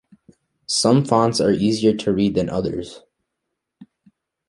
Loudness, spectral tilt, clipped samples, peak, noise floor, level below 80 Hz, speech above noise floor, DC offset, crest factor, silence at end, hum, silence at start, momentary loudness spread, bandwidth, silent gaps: -19 LUFS; -5.5 dB/octave; under 0.1%; -2 dBFS; -79 dBFS; -50 dBFS; 61 dB; under 0.1%; 18 dB; 0.65 s; none; 0.7 s; 13 LU; 11.5 kHz; none